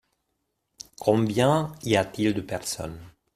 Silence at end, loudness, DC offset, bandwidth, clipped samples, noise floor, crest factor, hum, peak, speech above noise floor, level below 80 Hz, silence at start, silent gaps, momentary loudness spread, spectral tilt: 0.25 s; -25 LUFS; under 0.1%; 15.5 kHz; under 0.1%; -78 dBFS; 20 dB; none; -6 dBFS; 53 dB; -56 dBFS; 1 s; none; 20 LU; -5.5 dB/octave